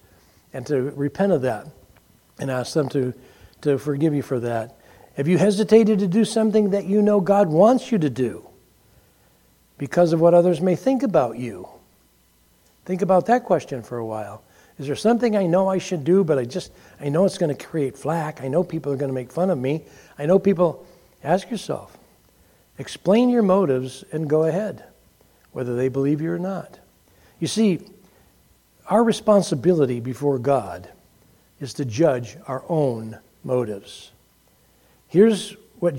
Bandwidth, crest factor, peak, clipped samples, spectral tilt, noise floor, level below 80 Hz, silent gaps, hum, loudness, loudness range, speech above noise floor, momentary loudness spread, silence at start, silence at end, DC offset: 16.5 kHz; 20 dB; -2 dBFS; under 0.1%; -7 dB/octave; -59 dBFS; -62 dBFS; none; none; -21 LUFS; 6 LU; 39 dB; 16 LU; 0.55 s; 0 s; under 0.1%